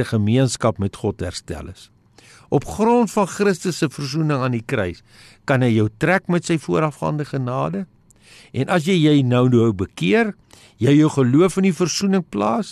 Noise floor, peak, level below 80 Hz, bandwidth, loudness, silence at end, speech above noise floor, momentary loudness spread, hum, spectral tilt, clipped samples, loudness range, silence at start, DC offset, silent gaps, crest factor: -49 dBFS; -6 dBFS; -50 dBFS; 13 kHz; -19 LUFS; 0 s; 30 dB; 12 LU; none; -6 dB/octave; under 0.1%; 5 LU; 0 s; under 0.1%; none; 14 dB